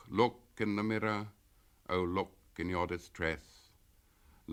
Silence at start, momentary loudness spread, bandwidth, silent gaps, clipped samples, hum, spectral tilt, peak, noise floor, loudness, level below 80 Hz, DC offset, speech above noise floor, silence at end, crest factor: 0.05 s; 12 LU; 16.5 kHz; none; under 0.1%; none; -6.5 dB/octave; -14 dBFS; -66 dBFS; -36 LUFS; -62 dBFS; under 0.1%; 32 dB; 0 s; 22 dB